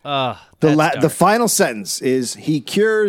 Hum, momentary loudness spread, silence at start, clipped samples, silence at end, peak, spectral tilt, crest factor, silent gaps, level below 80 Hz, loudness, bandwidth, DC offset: none; 7 LU; 0.05 s; under 0.1%; 0 s; 0 dBFS; -4.5 dB/octave; 16 dB; none; -60 dBFS; -17 LUFS; 17 kHz; under 0.1%